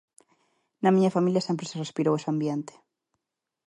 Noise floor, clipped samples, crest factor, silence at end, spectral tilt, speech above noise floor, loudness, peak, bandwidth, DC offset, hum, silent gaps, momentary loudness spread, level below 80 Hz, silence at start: -85 dBFS; under 0.1%; 18 dB; 1.05 s; -7 dB/octave; 60 dB; -26 LUFS; -10 dBFS; 11 kHz; under 0.1%; none; none; 11 LU; -76 dBFS; 0.8 s